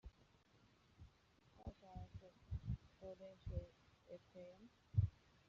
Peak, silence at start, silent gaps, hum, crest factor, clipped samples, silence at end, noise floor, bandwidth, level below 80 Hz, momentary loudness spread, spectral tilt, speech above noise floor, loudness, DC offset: -26 dBFS; 0.05 s; none; none; 26 dB; under 0.1%; 0.4 s; -74 dBFS; 6.8 kHz; -60 dBFS; 24 LU; -9 dB/octave; 20 dB; -50 LUFS; under 0.1%